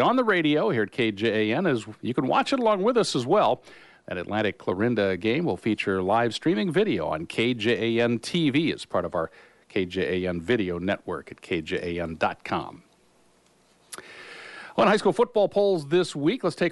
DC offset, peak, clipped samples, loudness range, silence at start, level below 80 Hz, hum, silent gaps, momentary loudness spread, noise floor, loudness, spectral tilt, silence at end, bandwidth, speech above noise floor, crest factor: under 0.1%; -10 dBFS; under 0.1%; 6 LU; 0 s; -60 dBFS; none; none; 10 LU; -61 dBFS; -25 LUFS; -5.5 dB/octave; 0 s; 11.5 kHz; 37 dB; 16 dB